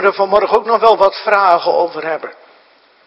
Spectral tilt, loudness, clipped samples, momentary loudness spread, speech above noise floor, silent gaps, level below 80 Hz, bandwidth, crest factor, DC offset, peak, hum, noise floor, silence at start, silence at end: -5 dB/octave; -13 LUFS; 0.2%; 11 LU; 37 dB; none; -54 dBFS; 7.8 kHz; 14 dB; under 0.1%; 0 dBFS; none; -50 dBFS; 0 s; 0.75 s